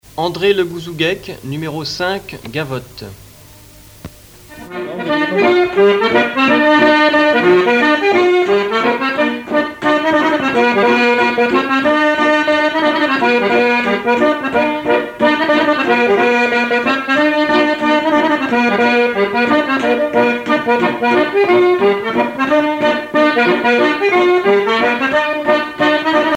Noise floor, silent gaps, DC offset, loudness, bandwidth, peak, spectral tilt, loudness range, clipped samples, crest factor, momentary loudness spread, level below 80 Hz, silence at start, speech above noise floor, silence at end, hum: -40 dBFS; none; under 0.1%; -13 LUFS; 17 kHz; 0 dBFS; -5 dB/octave; 8 LU; under 0.1%; 12 dB; 8 LU; -50 dBFS; 0.15 s; 26 dB; 0 s; none